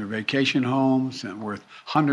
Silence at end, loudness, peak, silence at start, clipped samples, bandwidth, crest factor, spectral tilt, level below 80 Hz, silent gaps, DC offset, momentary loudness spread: 0 s; -24 LUFS; -8 dBFS; 0 s; under 0.1%; 10 kHz; 16 dB; -6 dB/octave; -70 dBFS; none; under 0.1%; 12 LU